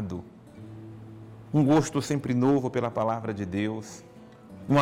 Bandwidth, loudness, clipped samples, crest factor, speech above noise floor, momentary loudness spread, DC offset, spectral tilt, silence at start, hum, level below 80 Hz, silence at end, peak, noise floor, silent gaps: 15.5 kHz; -27 LUFS; under 0.1%; 14 dB; 22 dB; 23 LU; under 0.1%; -7 dB/octave; 0 s; none; -60 dBFS; 0 s; -14 dBFS; -48 dBFS; none